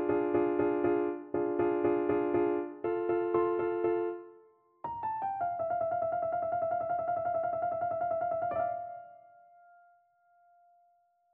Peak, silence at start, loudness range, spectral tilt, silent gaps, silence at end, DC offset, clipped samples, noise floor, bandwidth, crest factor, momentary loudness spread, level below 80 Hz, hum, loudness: -18 dBFS; 0 s; 6 LU; -7 dB/octave; none; 2.15 s; under 0.1%; under 0.1%; -70 dBFS; 3.6 kHz; 14 dB; 7 LU; -68 dBFS; none; -32 LUFS